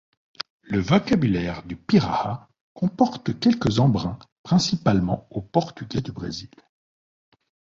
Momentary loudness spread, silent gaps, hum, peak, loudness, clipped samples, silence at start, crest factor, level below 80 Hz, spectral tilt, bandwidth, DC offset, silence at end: 14 LU; 2.61-2.75 s, 4.32-4.44 s; none; -4 dBFS; -23 LUFS; under 0.1%; 0.7 s; 20 dB; -48 dBFS; -6.5 dB/octave; 7.8 kHz; under 0.1%; 1.3 s